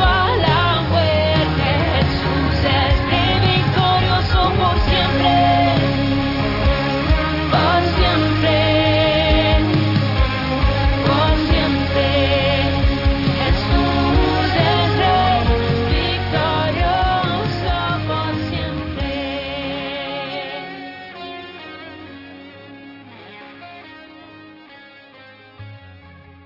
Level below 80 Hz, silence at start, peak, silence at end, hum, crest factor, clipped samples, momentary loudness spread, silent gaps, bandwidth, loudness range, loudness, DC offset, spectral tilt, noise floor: -26 dBFS; 0 s; -4 dBFS; 0.35 s; none; 14 dB; under 0.1%; 17 LU; none; 5.8 kHz; 13 LU; -17 LUFS; under 0.1%; -7.5 dB/octave; -43 dBFS